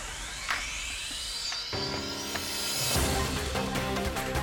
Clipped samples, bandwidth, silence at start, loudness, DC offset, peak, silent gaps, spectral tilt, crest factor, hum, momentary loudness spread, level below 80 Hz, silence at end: under 0.1%; 19 kHz; 0 s; -30 LUFS; under 0.1%; -14 dBFS; none; -3 dB/octave; 18 dB; none; 6 LU; -42 dBFS; 0 s